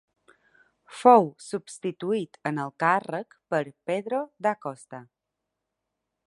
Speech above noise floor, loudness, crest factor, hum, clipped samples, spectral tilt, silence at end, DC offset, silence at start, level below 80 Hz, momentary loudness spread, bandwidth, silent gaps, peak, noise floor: 58 dB; -26 LUFS; 24 dB; none; under 0.1%; -6 dB/octave; 1.25 s; under 0.1%; 0.9 s; -80 dBFS; 19 LU; 11.5 kHz; none; -4 dBFS; -84 dBFS